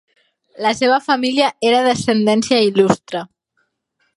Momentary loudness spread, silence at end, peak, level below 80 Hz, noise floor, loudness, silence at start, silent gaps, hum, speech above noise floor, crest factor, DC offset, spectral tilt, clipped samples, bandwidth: 6 LU; 0.9 s; 0 dBFS; -56 dBFS; -68 dBFS; -16 LUFS; 0.6 s; none; none; 52 dB; 16 dB; under 0.1%; -4.5 dB/octave; under 0.1%; 11.5 kHz